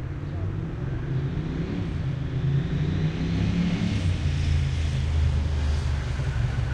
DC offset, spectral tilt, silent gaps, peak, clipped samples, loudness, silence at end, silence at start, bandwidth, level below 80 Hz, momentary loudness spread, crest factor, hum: under 0.1%; -7 dB/octave; none; -14 dBFS; under 0.1%; -27 LUFS; 0 s; 0 s; 9.4 kHz; -32 dBFS; 6 LU; 12 dB; none